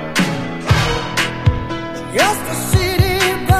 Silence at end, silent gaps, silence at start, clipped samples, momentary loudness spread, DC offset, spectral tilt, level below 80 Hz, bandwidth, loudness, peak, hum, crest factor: 0 s; none; 0 s; under 0.1%; 8 LU; under 0.1%; -4.5 dB/octave; -28 dBFS; 15.5 kHz; -17 LUFS; 0 dBFS; none; 16 dB